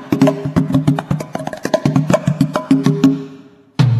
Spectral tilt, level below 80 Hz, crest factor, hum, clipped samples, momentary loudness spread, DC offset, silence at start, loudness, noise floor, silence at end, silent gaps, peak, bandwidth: -7.5 dB/octave; -44 dBFS; 16 dB; none; under 0.1%; 10 LU; under 0.1%; 0 s; -16 LUFS; -40 dBFS; 0 s; none; 0 dBFS; 13.5 kHz